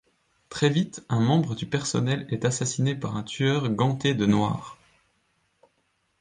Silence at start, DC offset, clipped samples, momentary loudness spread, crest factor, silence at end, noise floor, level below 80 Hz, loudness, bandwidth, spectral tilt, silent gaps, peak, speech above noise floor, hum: 0.5 s; under 0.1%; under 0.1%; 7 LU; 18 dB; 1.45 s; -72 dBFS; -58 dBFS; -25 LUFS; 10 kHz; -5.5 dB/octave; none; -8 dBFS; 47 dB; none